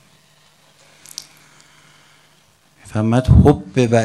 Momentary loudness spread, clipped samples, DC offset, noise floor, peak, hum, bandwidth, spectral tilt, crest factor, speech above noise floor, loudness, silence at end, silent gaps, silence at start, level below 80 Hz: 22 LU; under 0.1%; under 0.1%; -55 dBFS; 0 dBFS; none; 13 kHz; -7.5 dB/octave; 18 dB; 42 dB; -15 LUFS; 0 s; none; 2.95 s; -28 dBFS